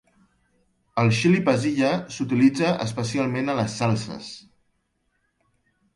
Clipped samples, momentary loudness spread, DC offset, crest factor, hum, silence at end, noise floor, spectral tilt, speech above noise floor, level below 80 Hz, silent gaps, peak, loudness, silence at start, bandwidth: under 0.1%; 13 LU; under 0.1%; 18 dB; none; 1.55 s; -72 dBFS; -6 dB/octave; 50 dB; -60 dBFS; none; -6 dBFS; -23 LUFS; 0.95 s; 11.5 kHz